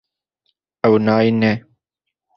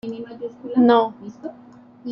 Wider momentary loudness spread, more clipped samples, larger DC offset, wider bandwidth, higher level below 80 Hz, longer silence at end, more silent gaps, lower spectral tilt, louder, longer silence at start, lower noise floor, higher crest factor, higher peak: second, 6 LU vs 21 LU; neither; neither; about the same, 6 kHz vs 5.8 kHz; first, -56 dBFS vs -66 dBFS; first, 0.8 s vs 0 s; neither; about the same, -8.5 dB/octave vs -7.5 dB/octave; about the same, -17 LUFS vs -18 LUFS; first, 0.85 s vs 0.05 s; first, -81 dBFS vs -42 dBFS; about the same, 18 dB vs 20 dB; about the same, -2 dBFS vs -2 dBFS